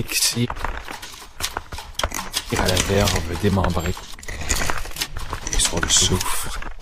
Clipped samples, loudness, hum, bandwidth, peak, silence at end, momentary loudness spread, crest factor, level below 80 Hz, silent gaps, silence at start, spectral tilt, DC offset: under 0.1%; -22 LUFS; none; 15.5 kHz; 0 dBFS; 0 s; 15 LU; 22 dB; -30 dBFS; none; 0 s; -3 dB/octave; under 0.1%